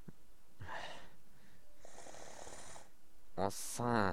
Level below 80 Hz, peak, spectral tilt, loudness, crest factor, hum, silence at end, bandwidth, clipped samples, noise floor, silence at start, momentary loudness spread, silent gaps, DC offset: -66 dBFS; -18 dBFS; -4.5 dB/octave; -43 LUFS; 24 dB; none; 0 s; 16.5 kHz; under 0.1%; -63 dBFS; 0 s; 22 LU; none; 0.6%